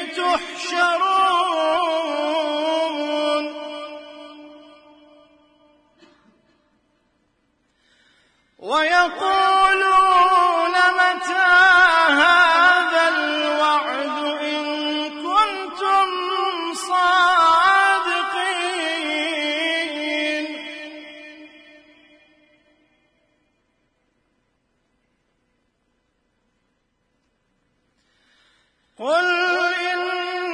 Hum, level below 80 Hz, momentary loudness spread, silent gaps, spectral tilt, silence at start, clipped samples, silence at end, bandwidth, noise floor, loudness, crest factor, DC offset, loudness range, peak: none; -60 dBFS; 12 LU; none; -1 dB/octave; 0 s; under 0.1%; 0 s; 11 kHz; -69 dBFS; -18 LUFS; 20 dB; under 0.1%; 14 LU; -2 dBFS